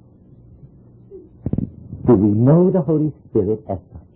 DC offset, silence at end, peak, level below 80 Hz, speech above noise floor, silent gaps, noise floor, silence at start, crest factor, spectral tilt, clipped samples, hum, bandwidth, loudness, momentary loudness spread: under 0.1%; 0.15 s; -4 dBFS; -42 dBFS; 31 dB; none; -46 dBFS; 1.1 s; 14 dB; -15.5 dB/octave; under 0.1%; none; 3 kHz; -17 LUFS; 16 LU